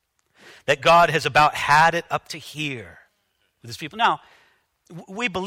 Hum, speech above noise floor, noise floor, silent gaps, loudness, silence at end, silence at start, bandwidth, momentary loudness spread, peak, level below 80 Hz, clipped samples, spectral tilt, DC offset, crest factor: none; 49 dB; -70 dBFS; none; -19 LUFS; 0 s; 0.7 s; 16 kHz; 19 LU; -2 dBFS; -54 dBFS; under 0.1%; -3.5 dB/octave; under 0.1%; 20 dB